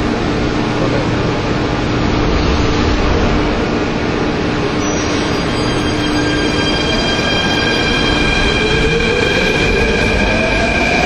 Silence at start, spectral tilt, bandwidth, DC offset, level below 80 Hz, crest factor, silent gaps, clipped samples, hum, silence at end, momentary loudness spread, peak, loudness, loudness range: 0 s; -5 dB/octave; 12.5 kHz; under 0.1%; -22 dBFS; 14 dB; none; under 0.1%; none; 0 s; 4 LU; 0 dBFS; -14 LUFS; 3 LU